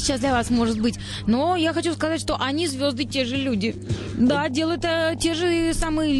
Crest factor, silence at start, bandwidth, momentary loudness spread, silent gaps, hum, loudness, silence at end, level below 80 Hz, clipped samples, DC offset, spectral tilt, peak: 12 dB; 0 s; 13 kHz; 4 LU; none; none; -23 LUFS; 0 s; -38 dBFS; under 0.1%; under 0.1%; -4.5 dB/octave; -10 dBFS